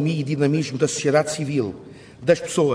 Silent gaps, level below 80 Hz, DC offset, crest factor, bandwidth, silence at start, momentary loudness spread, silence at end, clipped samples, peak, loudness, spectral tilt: none; -60 dBFS; under 0.1%; 18 dB; 11 kHz; 0 s; 8 LU; 0 s; under 0.1%; -4 dBFS; -22 LUFS; -5.5 dB/octave